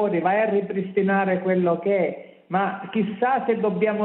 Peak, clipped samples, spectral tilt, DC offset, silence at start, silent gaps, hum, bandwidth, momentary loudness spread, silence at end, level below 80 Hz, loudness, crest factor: -8 dBFS; under 0.1%; -11.5 dB/octave; under 0.1%; 0 s; none; none; 4.1 kHz; 5 LU; 0 s; -68 dBFS; -23 LUFS; 14 dB